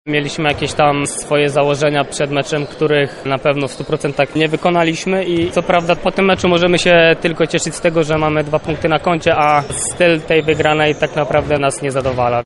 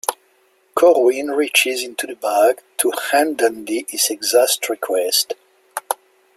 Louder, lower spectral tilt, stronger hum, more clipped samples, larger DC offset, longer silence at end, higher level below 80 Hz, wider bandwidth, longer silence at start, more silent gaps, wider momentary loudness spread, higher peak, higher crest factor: first, -15 LUFS vs -18 LUFS; first, -4.5 dB/octave vs 0 dB/octave; neither; neither; neither; second, 0 s vs 0.45 s; first, -40 dBFS vs -68 dBFS; second, 11.5 kHz vs 16.5 kHz; about the same, 0.05 s vs 0.1 s; neither; second, 6 LU vs 11 LU; about the same, -2 dBFS vs 0 dBFS; about the same, 14 dB vs 18 dB